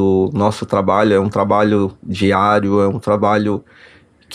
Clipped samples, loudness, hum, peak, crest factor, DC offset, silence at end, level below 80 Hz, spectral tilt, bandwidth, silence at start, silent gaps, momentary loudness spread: under 0.1%; -15 LUFS; none; -2 dBFS; 14 dB; under 0.1%; 0 s; -52 dBFS; -7 dB/octave; 11 kHz; 0 s; none; 5 LU